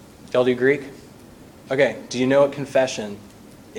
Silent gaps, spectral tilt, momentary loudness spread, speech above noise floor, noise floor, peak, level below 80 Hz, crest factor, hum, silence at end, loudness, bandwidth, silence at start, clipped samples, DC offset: none; -5 dB/octave; 14 LU; 25 dB; -45 dBFS; -4 dBFS; -58 dBFS; 18 dB; none; 0 s; -21 LUFS; 16.5 kHz; 0.25 s; under 0.1%; under 0.1%